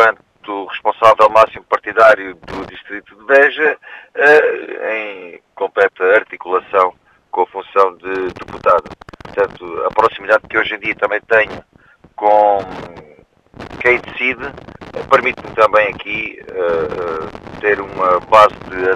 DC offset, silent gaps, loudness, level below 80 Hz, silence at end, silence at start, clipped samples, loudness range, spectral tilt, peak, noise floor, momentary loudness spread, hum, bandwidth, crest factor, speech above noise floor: under 0.1%; none; -14 LUFS; -48 dBFS; 0 s; 0 s; 0.2%; 4 LU; -4.5 dB/octave; 0 dBFS; -48 dBFS; 18 LU; none; 11 kHz; 16 dB; 33 dB